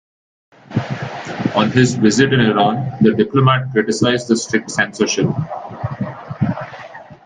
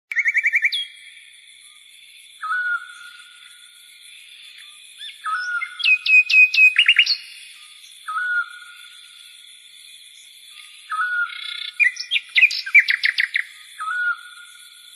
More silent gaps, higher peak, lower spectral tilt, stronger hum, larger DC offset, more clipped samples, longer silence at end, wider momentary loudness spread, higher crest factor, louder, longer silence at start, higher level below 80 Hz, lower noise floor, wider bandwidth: neither; about the same, 0 dBFS vs -2 dBFS; first, -5.5 dB/octave vs 5.5 dB/octave; neither; neither; neither; second, 0.1 s vs 0.5 s; second, 13 LU vs 26 LU; about the same, 16 dB vs 20 dB; about the same, -17 LUFS vs -17 LUFS; first, 0.7 s vs 0.1 s; first, -50 dBFS vs -80 dBFS; second, -36 dBFS vs -47 dBFS; second, 9.6 kHz vs 13 kHz